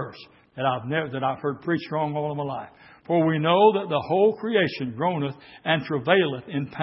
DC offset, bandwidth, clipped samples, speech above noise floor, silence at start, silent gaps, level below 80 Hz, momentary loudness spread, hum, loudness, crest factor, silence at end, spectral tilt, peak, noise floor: under 0.1%; 5.8 kHz; under 0.1%; 22 dB; 0 s; none; -66 dBFS; 12 LU; none; -24 LUFS; 22 dB; 0 s; -10.5 dB/octave; -4 dBFS; -46 dBFS